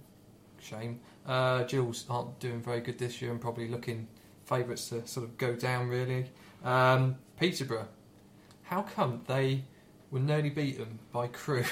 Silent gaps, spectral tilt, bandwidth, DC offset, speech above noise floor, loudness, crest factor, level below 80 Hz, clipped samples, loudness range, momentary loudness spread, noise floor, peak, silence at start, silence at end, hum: none; -6 dB/octave; 16 kHz; under 0.1%; 25 dB; -33 LUFS; 18 dB; -68 dBFS; under 0.1%; 5 LU; 13 LU; -57 dBFS; -14 dBFS; 0.25 s; 0 s; none